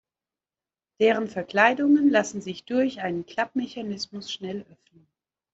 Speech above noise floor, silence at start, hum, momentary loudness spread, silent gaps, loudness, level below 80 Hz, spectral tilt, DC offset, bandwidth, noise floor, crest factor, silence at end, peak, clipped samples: over 65 dB; 1 s; none; 14 LU; none; -24 LUFS; -70 dBFS; -4.5 dB/octave; under 0.1%; 8 kHz; under -90 dBFS; 22 dB; 0.9 s; -4 dBFS; under 0.1%